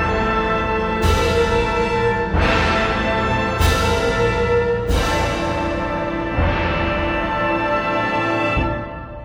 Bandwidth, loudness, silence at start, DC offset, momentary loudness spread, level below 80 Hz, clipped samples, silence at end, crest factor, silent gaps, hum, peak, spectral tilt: 16 kHz; -19 LUFS; 0 s; under 0.1%; 5 LU; -28 dBFS; under 0.1%; 0 s; 14 dB; none; none; -4 dBFS; -5.5 dB/octave